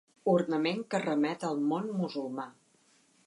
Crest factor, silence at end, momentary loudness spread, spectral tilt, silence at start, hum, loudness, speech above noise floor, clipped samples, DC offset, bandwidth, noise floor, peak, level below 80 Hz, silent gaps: 18 dB; 0.75 s; 10 LU; -6.5 dB/octave; 0.25 s; none; -31 LUFS; 36 dB; under 0.1%; under 0.1%; 11.5 kHz; -67 dBFS; -14 dBFS; -82 dBFS; none